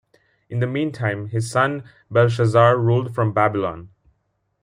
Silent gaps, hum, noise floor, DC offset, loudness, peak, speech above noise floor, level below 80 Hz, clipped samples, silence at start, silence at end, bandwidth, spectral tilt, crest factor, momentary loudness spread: none; none; -70 dBFS; under 0.1%; -20 LUFS; -2 dBFS; 51 dB; -58 dBFS; under 0.1%; 0.5 s; 0.75 s; 11 kHz; -7 dB/octave; 18 dB; 11 LU